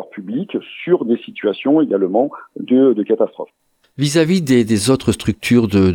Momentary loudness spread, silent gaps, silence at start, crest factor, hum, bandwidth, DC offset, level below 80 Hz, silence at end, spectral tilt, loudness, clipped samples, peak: 11 LU; none; 0 s; 14 dB; none; 18 kHz; under 0.1%; -48 dBFS; 0 s; -6 dB/octave; -16 LUFS; under 0.1%; -2 dBFS